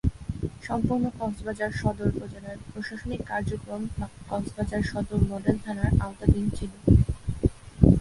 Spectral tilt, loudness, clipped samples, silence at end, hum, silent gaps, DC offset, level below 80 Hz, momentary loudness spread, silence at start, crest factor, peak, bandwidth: -8 dB/octave; -28 LUFS; under 0.1%; 0 s; none; none; under 0.1%; -34 dBFS; 13 LU; 0.05 s; 24 dB; -2 dBFS; 11.5 kHz